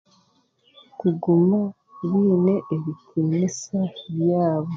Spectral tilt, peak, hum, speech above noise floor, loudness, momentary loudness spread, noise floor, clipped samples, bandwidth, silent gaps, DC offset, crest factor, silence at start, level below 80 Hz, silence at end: -8 dB/octave; -8 dBFS; none; 42 dB; -22 LUFS; 10 LU; -63 dBFS; under 0.1%; 7.6 kHz; none; under 0.1%; 14 dB; 1 s; -66 dBFS; 0 s